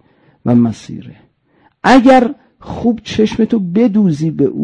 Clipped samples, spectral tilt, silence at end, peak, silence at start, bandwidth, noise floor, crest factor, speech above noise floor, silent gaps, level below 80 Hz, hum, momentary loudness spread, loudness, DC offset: under 0.1%; -7 dB/octave; 0 s; 0 dBFS; 0.45 s; 9.8 kHz; -54 dBFS; 14 dB; 42 dB; none; -44 dBFS; none; 20 LU; -12 LUFS; under 0.1%